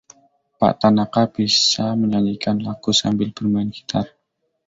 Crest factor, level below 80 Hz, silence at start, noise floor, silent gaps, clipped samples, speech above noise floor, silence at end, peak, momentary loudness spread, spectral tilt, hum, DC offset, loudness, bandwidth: 18 dB; -52 dBFS; 0.6 s; -72 dBFS; none; under 0.1%; 54 dB; 0.6 s; -2 dBFS; 9 LU; -4.5 dB/octave; none; under 0.1%; -19 LUFS; 7.8 kHz